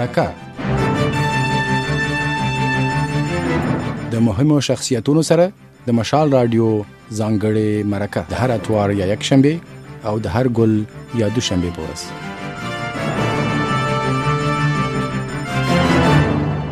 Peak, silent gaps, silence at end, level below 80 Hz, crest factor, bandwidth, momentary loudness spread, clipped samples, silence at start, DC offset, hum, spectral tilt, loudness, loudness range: 0 dBFS; none; 0 s; -38 dBFS; 18 dB; 14.5 kHz; 10 LU; under 0.1%; 0 s; under 0.1%; none; -6 dB/octave; -18 LUFS; 4 LU